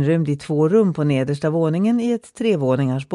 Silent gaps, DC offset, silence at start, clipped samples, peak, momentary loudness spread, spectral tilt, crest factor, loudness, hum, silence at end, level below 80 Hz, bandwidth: none; under 0.1%; 0 s; under 0.1%; -6 dBFS; 5 LU; -8 dB/octave; 14 dB; -19 LUFS; none; 0 s; -60 dBFS; 11 kHz